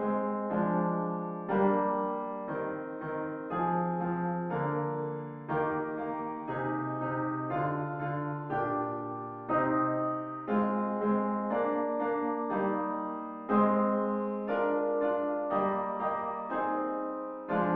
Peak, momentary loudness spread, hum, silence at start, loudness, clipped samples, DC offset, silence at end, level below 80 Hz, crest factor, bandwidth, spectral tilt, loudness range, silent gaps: -14 dBFS; 8 LU; none; 0 s; -32 LUFS; under 0.1%; under 0.1%; 0 s; -68 dBFS; 18 dB; 4 kHz; -7.5 dB/octave; 3 LU; none